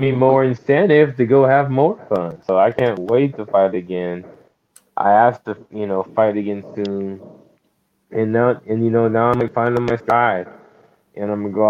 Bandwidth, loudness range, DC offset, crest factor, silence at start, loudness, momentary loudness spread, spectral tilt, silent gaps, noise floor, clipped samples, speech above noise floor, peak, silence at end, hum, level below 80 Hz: 7 kHz; 5 LU; under 0.1%; 16 dB; 0 s; -17 LUFS; 13 LU; -9 dB/octave; none; -66 dBFS; under 0.1%; 49 dB; 0 dBFS; 0 s; none; -56 dBFS